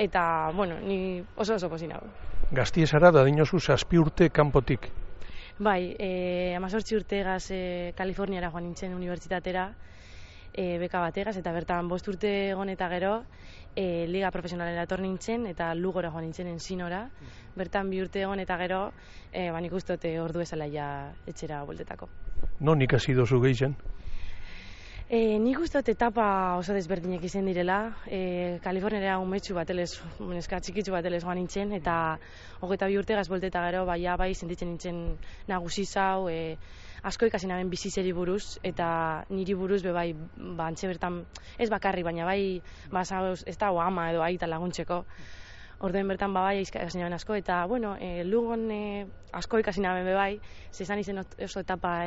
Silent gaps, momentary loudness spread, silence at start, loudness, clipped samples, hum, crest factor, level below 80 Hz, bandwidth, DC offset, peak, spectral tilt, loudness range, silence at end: none; 15 LU; 0 s; -29 LUFS; under 0.1%; none; 24 dB; -44 dBFS; 8 kHz; under 0.1%; -6 dBFS; -5.5 dB/octave; 8 LU; 0 s